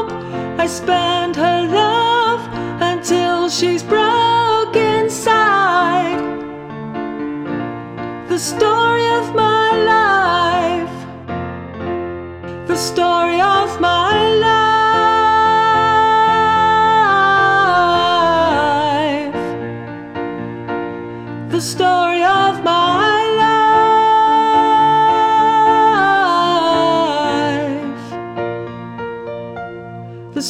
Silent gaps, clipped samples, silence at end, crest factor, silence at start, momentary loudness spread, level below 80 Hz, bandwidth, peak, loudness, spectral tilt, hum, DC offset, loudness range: none; under 0.1%; 0 s; 12 dB; 0 s; 15 LU; -50 dBFS; 15.5 kHz; -2 dBFS; -14 LUFS; -4 dB/octave; none; under 0.1%; 7 LU